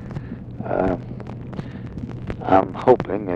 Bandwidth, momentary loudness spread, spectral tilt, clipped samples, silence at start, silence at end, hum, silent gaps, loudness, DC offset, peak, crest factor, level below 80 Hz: 7.4 kHz; 16 LU; -9 dB/octave; under 0.1%; 0 s; 0 s; none; none; -22 LUFS; under 0.1%; -2 dBFS; 22 dB; -42 dBFS